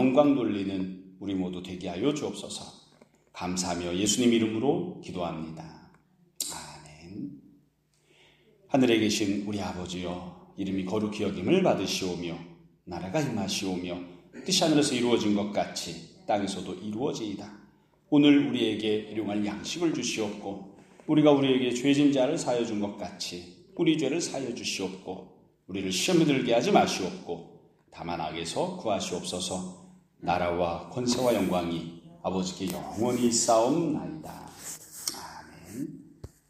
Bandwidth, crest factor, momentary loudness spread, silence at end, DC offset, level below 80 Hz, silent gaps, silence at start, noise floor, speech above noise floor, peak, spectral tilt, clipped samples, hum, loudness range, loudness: 15.5 kHz; 22 dB; 18 LU; 0.25 s; under 0.1%; -62 dBFS; none; 0 s; -68 dBFS; 40 dB; -6 dBFS; -4.5 dB/octave; under 0.1%; none; 6 LU; -28 LUFS